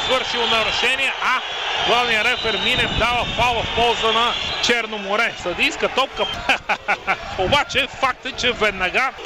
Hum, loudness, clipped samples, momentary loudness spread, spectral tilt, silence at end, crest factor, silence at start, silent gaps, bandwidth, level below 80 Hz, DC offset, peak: none; -18 LUFS; under 0.1%; 4 LU; -2.5 dB/octave; 0 s; 16 dB; 0 s; none; 15.5 kHz; -40 dBFS; under 0.1%; -4 dBFS